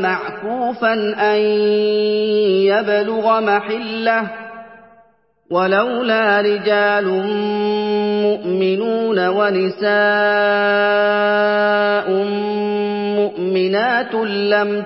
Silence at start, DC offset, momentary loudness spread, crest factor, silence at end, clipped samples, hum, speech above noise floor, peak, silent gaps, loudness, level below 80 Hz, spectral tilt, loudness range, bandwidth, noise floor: 0 s; under 0.1%; 5 LU; 14 dB; 0 s; under 0.1%; none; 39 dB; -2 dBFS; none; -16 LUFS; -64 dBFS; -10 dB/octave; 3 LU; 5.8 kHz; -55 dBFS